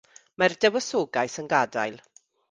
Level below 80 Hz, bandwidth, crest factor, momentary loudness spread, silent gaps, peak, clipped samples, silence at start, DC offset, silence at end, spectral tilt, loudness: -70 dBFS; 10 kHz; 22 dB; 7 LU; none; -4 dBFS; under 0.1%; 0.4 s; under 0.1%; 0.55 s; -3.5 dB/octave; -25 LUFS